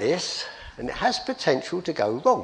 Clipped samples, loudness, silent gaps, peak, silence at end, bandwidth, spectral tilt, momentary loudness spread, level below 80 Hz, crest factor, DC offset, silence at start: under 0.1%; -26 LUFS; none; -6 dBFS; 0 s; 10.5 kHz; -4 dB/octave; 10 LU; -52 dBFS; 18 dB; under 0.1%; 0 s